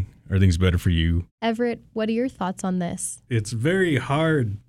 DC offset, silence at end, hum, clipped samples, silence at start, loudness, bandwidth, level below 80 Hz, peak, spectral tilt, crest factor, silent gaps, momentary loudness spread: under 0.1%; 0.1 s; none; under 0.1%; 0 s; -23 LUFS; 13.5 kHz; -42 dBFS; -8 dBFS; -6 dB/octave; 14 dB; 1.31-1.38 s; 6 LU